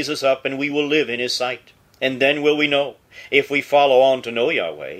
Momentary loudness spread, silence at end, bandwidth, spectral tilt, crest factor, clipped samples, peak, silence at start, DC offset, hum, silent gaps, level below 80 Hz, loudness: 9 LU; 0 s; 15 kHz; -3.5 dB/octave; 18 dB; under 0.1%; 0 dBFS; 0 s; under 0.1%; none; none; -64 dBFS; -19 LUFS